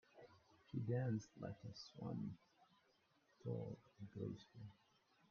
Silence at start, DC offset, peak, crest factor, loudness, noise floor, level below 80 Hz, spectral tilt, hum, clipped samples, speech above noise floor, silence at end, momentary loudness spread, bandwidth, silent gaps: 0.15 s; under 0.1%; -30 dBFS; 20 dB; -49 LUFS; -79 dBFS; -80 dBFS; -8 dB/octave; none; under 0.1%; 31 dB; 0.55 s; 19 LU; 6.8 kHz; none